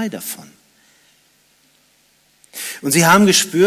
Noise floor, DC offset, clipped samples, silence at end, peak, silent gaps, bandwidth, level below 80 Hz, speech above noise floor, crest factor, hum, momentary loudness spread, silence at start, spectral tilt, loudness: -57 dBFS; under 0.1%; under 0.1%; 0 s; -2 dBFS; none; 16 kHz; -62 dBFS; 43 dB; 16 dB; none; 21 LU; 0 s; -3.5 dB/octave; -14 LUFS